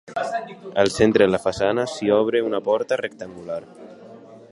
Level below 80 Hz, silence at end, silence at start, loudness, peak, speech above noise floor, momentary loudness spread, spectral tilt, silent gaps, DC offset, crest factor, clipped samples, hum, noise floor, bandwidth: -52 dBFS; 0.15 s; 0.05 s; -21 LUFS; -2 dBFS; 22 dB; 15 LU; -5 dB/octave; none; under 0.1%; 20 dB; under 0.1%; none; -43 dBFS; 11.5 kHz